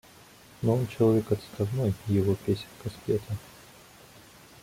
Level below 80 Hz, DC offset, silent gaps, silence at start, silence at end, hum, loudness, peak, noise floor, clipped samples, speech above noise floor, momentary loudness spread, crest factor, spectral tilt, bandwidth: -58 dBFS; under 0.1%; none; 0.6 s; 1.15 s; none; -29 LUFS; -12 dBFS; -53 dBFS; under 0.1%; 26 dB; 14 LU; 18 dB; -8 dB/octave; 16.5 kHz